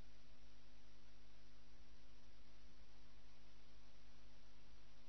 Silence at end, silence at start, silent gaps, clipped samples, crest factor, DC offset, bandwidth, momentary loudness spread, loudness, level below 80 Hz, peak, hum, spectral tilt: 0 s; 0 s; none; under 0.1%; 12 dB; 0.5%; 6.2 kHz; 1 LU; -69 LUFS; -70 dBFS; -44 dBFS; none; -4 dB/octave